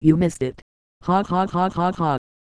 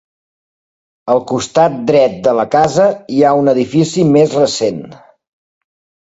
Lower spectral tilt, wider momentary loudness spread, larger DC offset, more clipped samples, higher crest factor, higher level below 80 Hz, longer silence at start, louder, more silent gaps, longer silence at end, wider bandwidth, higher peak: first, -7.5 dB/octave vs -6 dB/octave; first, 9 LU vs 6 LU; neither; neither; about the same, 18 dB vs 14 dB; first, -48 dBFS vs -54 dBFS; second, 0 s vs 1.05 s; second, -22 LUFS vs -12 LUFS; first, 0.62-1.01 s vs none; second, 0.35 s vs 1.15 s; first, 11 kHz vs 8 kHz; second, -4 dBFS vs 0 dBFS